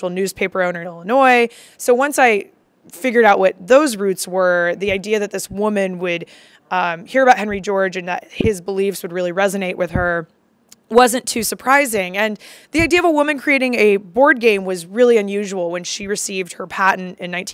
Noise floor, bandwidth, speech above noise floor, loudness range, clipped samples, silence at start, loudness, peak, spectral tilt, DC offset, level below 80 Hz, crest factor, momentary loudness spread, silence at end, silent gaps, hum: -52 dBFS; 16.5 kHz; 35 dB; 4 LU; under 0.1%; 0 s; -17 LUFS; 0 dBFS; -4 dB/octave; under 0.1%; -44 dBFS; 16 dB; 10 LU; 0 s; none; none